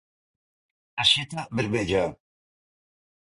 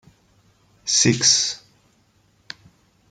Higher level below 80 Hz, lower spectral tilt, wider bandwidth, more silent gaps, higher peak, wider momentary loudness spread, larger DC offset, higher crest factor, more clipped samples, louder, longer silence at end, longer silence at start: first, -54 dBFS vs -62 dBFS; first, -4 dB/octave vs -2 dB/octave; about the same, 11.5 kHz vs 11 kHz; neither; second, -6 dBFS vs -2 dBFS; second, 11 LU vs 25 LU; neither; about the same, 24 dB vs 22 dB; neither; second, -24 LUFS vs -17 LUFS; second, 1.1 s vs 1.55 s; about the same, 0.95 s vs 0.85 s